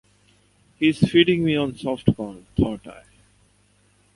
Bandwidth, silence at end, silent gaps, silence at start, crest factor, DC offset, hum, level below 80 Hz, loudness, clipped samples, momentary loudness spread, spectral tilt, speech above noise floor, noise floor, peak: 11.5 kHz; 1.15 s; none; 0.8 s; 22 dB; under 0.1%; 50 Hz at -45 dBFS; -44 dBFS; -21 LUFS; under 0.1%; 11 LU; -7 dB/octave; 39 dB; -60 dBFS; -2 dBFS